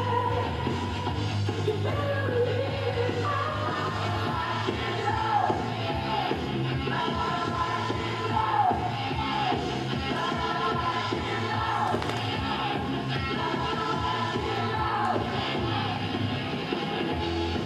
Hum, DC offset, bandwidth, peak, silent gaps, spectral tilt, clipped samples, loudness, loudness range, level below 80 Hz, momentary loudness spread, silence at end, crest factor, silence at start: none; under 0.1%; 12.5 kHz; -12 dBFS; none; -6 dB/octave; under 0.1%; -28 LUFS; 1 LU; -46 dBFS; 3 LU; 0 s; 16 dB; 0 s